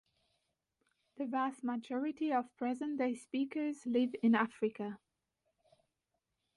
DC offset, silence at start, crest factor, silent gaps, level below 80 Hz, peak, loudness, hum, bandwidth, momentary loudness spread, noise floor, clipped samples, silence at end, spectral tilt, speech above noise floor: under 0.1%; 1.2 s; 18 dB; none; -82 dBFS; -20 dBFS; -36 LUFS; none; 11.5 kHz; 9 LU; -86 dBFS; under 0.1%; 1.6 s; -6 dB/octave; 51 dB